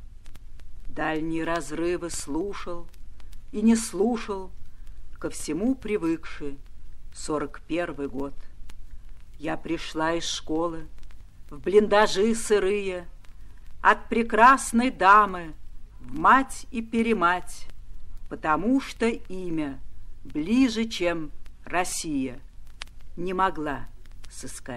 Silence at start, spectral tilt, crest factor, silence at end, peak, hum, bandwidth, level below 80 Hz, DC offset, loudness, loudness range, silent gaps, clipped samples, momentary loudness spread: 0 s; -4 dB/octave; 22 dB; 0 s; -4 dBFS; none; 13.5 kHz; -42 dBFS; under 0.1%; -25 LUFS; 10 LU; none; under 0.1%; 20 LU